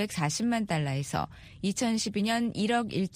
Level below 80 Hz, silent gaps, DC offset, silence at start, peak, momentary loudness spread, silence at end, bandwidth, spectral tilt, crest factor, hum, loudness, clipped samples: -58 dBFS; none; under 0.1%; 0 s; -14 dBFS; 6 LU; 0 s; 15.5 kHz; -4.5 dB/octave; 16 dB; none; -29 LUFS; under 0.1%